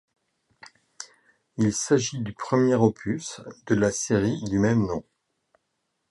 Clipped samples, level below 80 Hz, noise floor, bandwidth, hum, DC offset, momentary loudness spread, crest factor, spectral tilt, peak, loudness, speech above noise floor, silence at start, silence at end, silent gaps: under 0.1%; -54 dBFS; -77 dBFS; 11.5 kHz; none; under 0.1%; 19 LU; 20 dB; -5.5 dB/octave; -6 dBFS; -24 LUFS; 53 dB; 1 s; 1.1 s; none